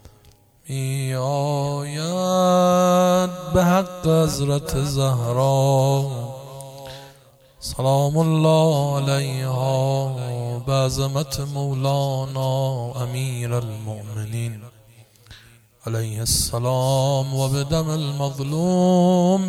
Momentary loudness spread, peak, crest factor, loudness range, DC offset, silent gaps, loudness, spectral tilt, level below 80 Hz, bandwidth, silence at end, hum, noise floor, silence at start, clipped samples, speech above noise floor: 14 LU; -6 dBFS; 16 dB; 7 LU; under 0.1%; none; -21 LUFS; -6 dB/octave; -44 dBFS; 16.5 kHz; 0 s; none; -53 dBFS; 0.65 s; under 0.1%; 32 dB